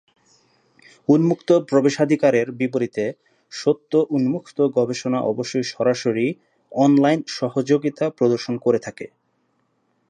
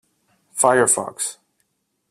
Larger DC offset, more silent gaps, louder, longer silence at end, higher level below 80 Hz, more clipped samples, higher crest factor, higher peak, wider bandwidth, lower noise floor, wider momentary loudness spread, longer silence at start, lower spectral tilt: neither; neither; about the same, -20 LUFS vs -18 LUFS; first, 1.05 s vs 0.75 s; about the same, -70 dBFS vs -66 dBFS; neither; about the same, 16 dB vs 20 dB; about the same, -4 dBFS vs -2 dBFS; second, 9.6 kHz vs 15.5 kHz; about the same, -67 dBFS vs -70 dBFS; second, 9 LU vs 12 LU; first, 1.1 s vs 0.55 s; first, -6.5 dB/octave vs -2.5 dB/octave